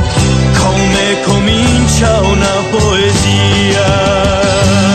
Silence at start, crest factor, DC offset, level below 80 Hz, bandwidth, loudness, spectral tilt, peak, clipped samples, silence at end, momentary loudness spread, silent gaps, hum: 0 s; 8 dB; under 0.1%; -20 dBFS; 13.5 kHz; -10 LUFS; -4.5 dB/octave; 0 dBFS; under 0.1%; 0 s; 2 LU; none; none